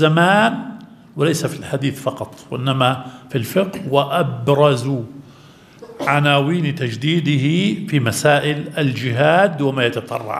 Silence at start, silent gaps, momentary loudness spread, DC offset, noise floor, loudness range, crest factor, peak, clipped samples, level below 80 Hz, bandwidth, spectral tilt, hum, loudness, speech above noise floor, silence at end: 0 s; none; 11 LU; under 0.1%; -45 dBFS; 3 LU; 18 dB; 0 dBFS; under 0.1%; -60 dBFS; 14.5 kHz; -5.5 dB/octave; none; -18 LUFS; 27 dB; 0 s